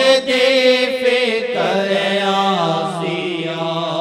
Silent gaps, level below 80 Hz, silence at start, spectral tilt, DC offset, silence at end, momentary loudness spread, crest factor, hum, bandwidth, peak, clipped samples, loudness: none; -66 dBFS; 0 s; -4 dB/octave; under 0.1%; 0 s; 8 LU; 16 dB; none; 13.5 kHz; 0 dBFS; under 0.1%; -16 LUFS